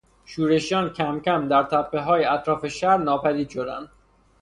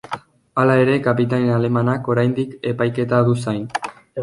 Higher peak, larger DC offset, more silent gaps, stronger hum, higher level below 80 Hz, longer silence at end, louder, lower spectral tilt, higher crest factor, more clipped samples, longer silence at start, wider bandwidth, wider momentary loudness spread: about the same, -6 dBFS vs -4 dBFS; neither; neither; neither; about the same, -56 dBFS vs -56 dBFS; first, 0.55 s vs 0 s; second, -22 LUFS vs -19 LUFS; second, -5.5 dB/octave vs -8 dB/octave; about the same, 16 dB vs 16 dB; neither; first, 0.3 s vs 0.1 s; about the same, 11 kHz vs 11.5 kHz; about the same, 9 LU vs 11 LU